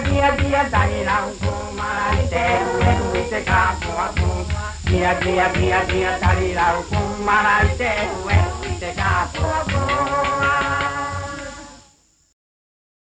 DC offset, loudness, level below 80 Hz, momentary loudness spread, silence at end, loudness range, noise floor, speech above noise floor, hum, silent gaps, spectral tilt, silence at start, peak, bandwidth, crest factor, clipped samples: under 0.1%; -19 LUFS; -30 dBFS; 8 LU; 1.25 s; 3 LU; -56 dBFS; 37 dB; none; none; -5.5 dB/octave; 0 s; -4 dBFS; 9.6 kHz; 16 dB; under 0.1%